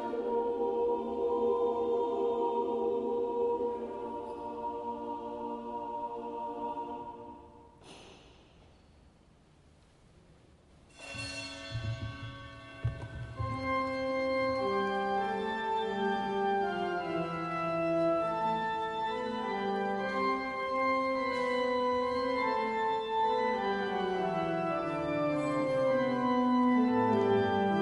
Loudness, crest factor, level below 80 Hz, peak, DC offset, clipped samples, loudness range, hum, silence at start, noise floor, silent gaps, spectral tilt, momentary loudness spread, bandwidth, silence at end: -32 LUFS; 16 dB; -58 dBFS; -16 dBFS; under 0.1%; under 0.1%; 12 LU; none; 0 s; -62 dBFS; none; -6.5 dB/octave; 11 LU; 11.5 kHz; 0 s